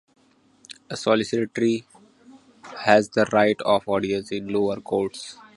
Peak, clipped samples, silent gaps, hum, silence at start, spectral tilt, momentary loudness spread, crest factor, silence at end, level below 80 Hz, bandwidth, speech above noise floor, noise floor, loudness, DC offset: 0 dBFS; under 0.1%; none; none; 0.7 s; -5 dB/octave; 16 LU; 24 dB; 0.25 s; -60 dBFS; 11.5 kHz; 35 dB; -57 dBFS; -23 LUFS; under 0.1%